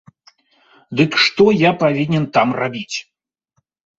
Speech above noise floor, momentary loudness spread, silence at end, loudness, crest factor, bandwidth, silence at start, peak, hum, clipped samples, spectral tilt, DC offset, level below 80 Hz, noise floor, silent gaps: 53 dB; 13 LU; 0.95 s; -16 LUFS; 18 dB; 7.8 kHz; 0.9 s; 0 dBFS; none; under 0.1%; -5.5 dB/octave; under 0.1%; -56 dBFS; -68 dBFS; none